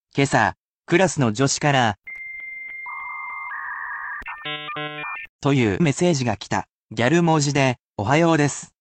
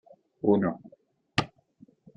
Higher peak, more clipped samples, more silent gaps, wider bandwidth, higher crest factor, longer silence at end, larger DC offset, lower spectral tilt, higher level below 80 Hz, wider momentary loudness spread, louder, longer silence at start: first, -4 dBFS vs -8 dBFS; neither; first, 0.57-0.80 s, 5.29-5.39 s, 6.71-6.87 s, 7.81-7.94 s vs none; about the same, 9.2 kHz vs 9.4 kHz; second, 18 dB vs 24 dB; second, 0.15 s vs 0.7 s; neither; second, -5 dB/octave vs -6.5 dB/octave; first, -56 dBFS vs -64 dBFS; second, 13 LU vs 17 LU; first, -22 LUFS vs -28 LUFS; second, 0.15 s vs 0.45 s